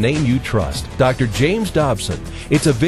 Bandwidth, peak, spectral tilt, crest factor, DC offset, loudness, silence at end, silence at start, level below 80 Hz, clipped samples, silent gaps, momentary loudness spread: 13 kHz; -2 dBFS; -5.5 dB/octave; 16 dB; under 0.1%; -18 LUFS; 0 s; 0 s; -32 dBFS; under 0.1%; none; 7 LU